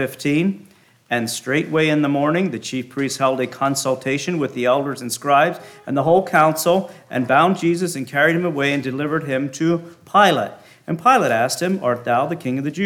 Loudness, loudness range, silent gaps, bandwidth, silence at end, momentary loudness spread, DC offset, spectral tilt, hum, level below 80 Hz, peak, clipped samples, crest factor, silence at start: -19 LUFS; 3 LU; none; 18.5 kHz; 0 s; 9 LU; under 0.1%; -5 dB/octave; none; -66 dBFS; -2 dBFS; under 0.1%; 18 dB; 0 s